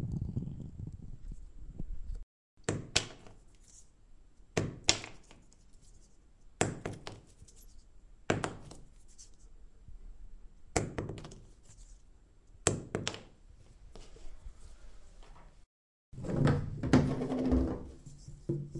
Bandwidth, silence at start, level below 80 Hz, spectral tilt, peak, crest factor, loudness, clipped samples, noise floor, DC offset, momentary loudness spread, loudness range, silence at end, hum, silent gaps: 12 kHz; 0 s; -48 dBFS; -4.5 dB/octave; -6 dBFS; 32 dB; -35 LUFS; under 0.1%; -59 dBFS; under 0.1%; 27 LU; 10 LU; 0 s; none; 2.23-2.57 s, 15.66-16.12 s